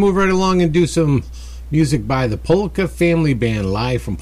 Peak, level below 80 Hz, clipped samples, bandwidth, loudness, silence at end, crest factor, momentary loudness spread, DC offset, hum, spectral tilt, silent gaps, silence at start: -4 dBFS; -32 dBFS; under 0.1%; 14.5 kHz; -17 LUFS; 0 s; 12 dB; 6 LU; under 0.1%; none; -6.5 dB/octave; none; 0 s